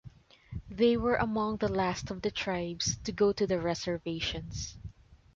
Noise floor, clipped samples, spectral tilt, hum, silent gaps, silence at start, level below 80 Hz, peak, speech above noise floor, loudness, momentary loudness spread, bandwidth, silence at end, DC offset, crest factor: -52 dBFS; under 0.1%; -4.5 dB/octave; none; none; 0.05 s; -50 dBFS; -14 dBFS; 21 dB; -31 LUFS; 15 LU; 7.8 kHz; 0.2 s; under 0.1%; 18 dB